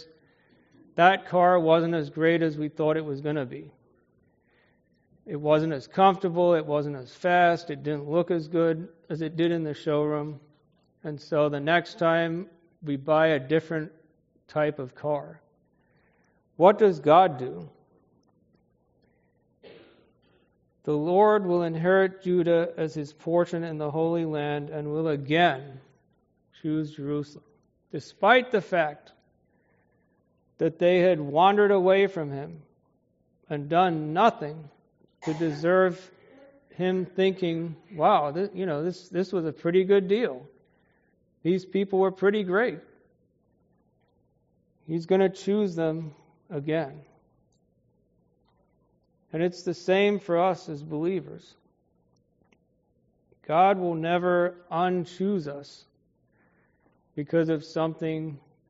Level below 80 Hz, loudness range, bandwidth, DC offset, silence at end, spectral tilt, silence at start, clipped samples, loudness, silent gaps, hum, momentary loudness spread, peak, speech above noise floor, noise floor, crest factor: -72 dBFS; 6 LU; 7.6 kHz; under 0.1%; 0.35 s; -5 dB/octave; 0 s; under 0.1%; -25 LUFS; none; none; 16 LU; -4 dBFS; 44 dB; -69 dBFS; 22 dB